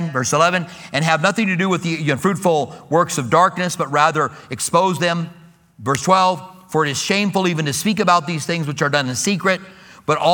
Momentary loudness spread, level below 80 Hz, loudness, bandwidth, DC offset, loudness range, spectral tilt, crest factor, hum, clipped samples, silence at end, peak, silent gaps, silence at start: 8 LU; -60 dBFS; -18 LUFS; 19 kHz; under 0.1%; 1 LU; -4 dB/octave; 18 dB; none; under 0.1%; 0 s; 0 dBFS; none; 0 s